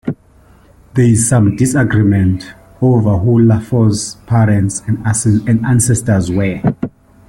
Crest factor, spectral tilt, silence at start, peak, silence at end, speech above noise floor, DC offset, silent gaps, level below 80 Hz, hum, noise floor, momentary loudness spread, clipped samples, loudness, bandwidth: 12 dB; -6.5 dB/octave; 0.05 s; -2 dBFS; 0.4 s; 34 dB; under 0.1%; none; -40 dBFS; none; -45 dBFS; 10 LU; under 0.1%; -13 LUFS; 13 kHz